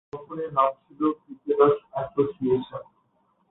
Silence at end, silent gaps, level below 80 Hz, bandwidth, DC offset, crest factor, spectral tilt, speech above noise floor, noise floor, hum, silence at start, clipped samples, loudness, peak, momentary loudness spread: 0.7 s; none; -62 dBFS; 4 kHz; under 0.1%; 20 dB; -10.5 dB/octave; 43 dB; -68 dBFS; none; 0.15 s; under 0.1%; -25 LUFS; -6 dBFS; 16 LU